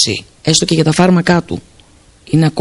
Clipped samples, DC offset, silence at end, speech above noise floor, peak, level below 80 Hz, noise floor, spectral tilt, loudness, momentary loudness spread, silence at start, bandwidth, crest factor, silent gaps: under 0.1%; under 0.1%; 0 s; 33 dB; 0 dBFS; -42 dBFS; -45 dBFS; -4.5 dB/octave; -12 LUFS; 10 LU; 0 s; 11.5 kHz; 14 dB; none